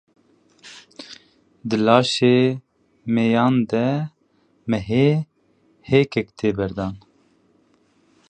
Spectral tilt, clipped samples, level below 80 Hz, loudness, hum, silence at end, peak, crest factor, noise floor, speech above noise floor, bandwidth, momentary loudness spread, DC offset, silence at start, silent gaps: -6.5 dB/octave; under 0.1%; -52 dBFS; -20 LUFS; none; 1.3 s; 0 dBFS; 22 dB; -62 dBFS; 43 dB; 9 kHz; 23 LU; under 0.1%; 0.65 s; none